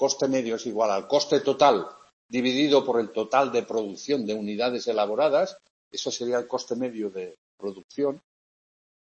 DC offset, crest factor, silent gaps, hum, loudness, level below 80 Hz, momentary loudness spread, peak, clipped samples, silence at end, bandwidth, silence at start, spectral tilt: under 0.1%; 20 dB; 2.13-2.29 s, 5.70-5.91 s, 7.38-7.58 s, 7.84-7.89 s; none; -25 LUFS; -74 dBFS; 15 LU; -6 dBFS; under 0.1%; 1 s; 8.2 kHz; 0 s; -4 dB/octave